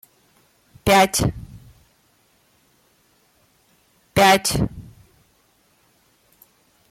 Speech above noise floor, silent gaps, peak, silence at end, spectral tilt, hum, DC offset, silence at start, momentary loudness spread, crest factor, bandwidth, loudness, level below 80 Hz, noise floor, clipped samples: 45 dB; none; -6 dBFS; 2.1 s; -3.5 dB/octave; none; under 0.1%; 0.85 s; 25 LU; 18 dB; 16.5 kHz; -18 LUFS; -44 dBFS; -61 dBFS; under 0.1%